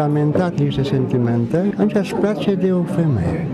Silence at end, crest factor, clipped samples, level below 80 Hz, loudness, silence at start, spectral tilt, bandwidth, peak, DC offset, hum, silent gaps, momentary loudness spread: 0 s; 12 dB; under 0.1%; -44 dBFS; -18 LUFS; 0 s; -8.5 dB/octave; 12 kHz; -4 dBFS; under 0.1%; none; none; 2 LU